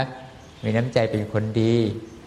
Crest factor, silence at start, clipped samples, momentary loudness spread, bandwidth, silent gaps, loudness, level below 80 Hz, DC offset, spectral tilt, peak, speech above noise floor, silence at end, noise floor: 20 dB; 0 s; under 0.1%; 12 LU; 11 kHz; none; -23 LUFS; -54 dBFS; under 0.1%; -7.5 dB/octave; -4 dBFS; 20 dB; 0 s; -42 dBFS